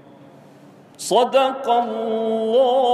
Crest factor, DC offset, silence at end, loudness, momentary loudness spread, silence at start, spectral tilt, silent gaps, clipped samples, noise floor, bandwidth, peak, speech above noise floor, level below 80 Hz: 16 dB; under 0.1%; 0 s; -19 LUFS; 7 LU; 1 s; -3.5 dB/octave; none; under 0.1%; -46 dBFS; 14 kHz; -4 dBFS; 28 dB; -74 dBFS